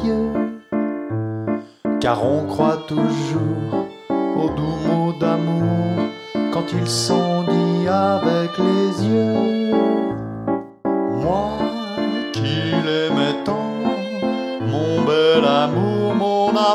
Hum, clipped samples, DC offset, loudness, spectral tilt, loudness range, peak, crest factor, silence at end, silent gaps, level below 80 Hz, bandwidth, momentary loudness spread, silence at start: none; under 0.1%; under 0.1%; -20 LUFS; -6 dB/octave; 3 LU; -4 dBFS; 16 dB; 0 s; none; -50 dBFS; 13 kHz; 7 LU; 0 s